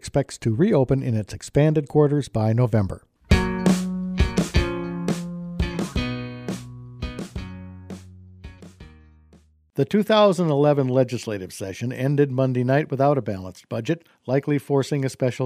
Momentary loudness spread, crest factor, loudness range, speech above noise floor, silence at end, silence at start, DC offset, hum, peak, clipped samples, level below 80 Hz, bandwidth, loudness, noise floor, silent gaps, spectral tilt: 15 LU; 18 dB; 11 LU; 34 dB; 0 s; 0.05 s; under 0.1%; none; -4 dBFS; under 0.1%; -36 dBFS; 15 kHz; -23 LUFS; -55 dBFS; none; -7 dB/octave